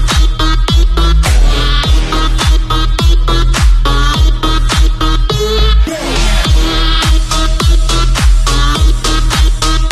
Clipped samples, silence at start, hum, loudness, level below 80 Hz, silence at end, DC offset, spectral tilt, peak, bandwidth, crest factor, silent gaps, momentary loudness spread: under 0.1%; 0 s; none; -12 LUFS; -10 dBFS; 0 s; under 0.1%; -4 dB/octave; 0 dBFS; 13 kHz; 8 dB; none; 2 LU